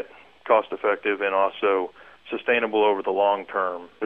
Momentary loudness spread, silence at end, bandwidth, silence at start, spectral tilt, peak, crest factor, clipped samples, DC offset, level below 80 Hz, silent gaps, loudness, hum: 11 LU; 0 s; 4.5 kHz; 0 s; -6.5 dB/octave; -6 dBFS; 18 dB; under 0.1%; 0.1%; -70 dBFS; none; -23 LUFS; none